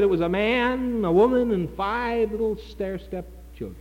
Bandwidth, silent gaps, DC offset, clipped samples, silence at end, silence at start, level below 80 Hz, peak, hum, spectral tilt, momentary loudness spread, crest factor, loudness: 16.5 kHz; none; under 0.1%; under 0.1%; 0 s; 0 s; -42 dBFS; -10 dBFS; none; -7.5 dB/octave; 16 LU; 14 dB; -24 LUFS